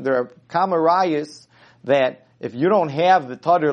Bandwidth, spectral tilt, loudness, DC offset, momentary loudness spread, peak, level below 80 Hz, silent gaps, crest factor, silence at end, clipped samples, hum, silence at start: 9 kHz; -6.5 dB/octave; -19 LUFS; under 0.1%; 15 LU; -2 dBFS; -70 dBFS; none; 16 dB; 0 s; under 0.1%; none; 0 s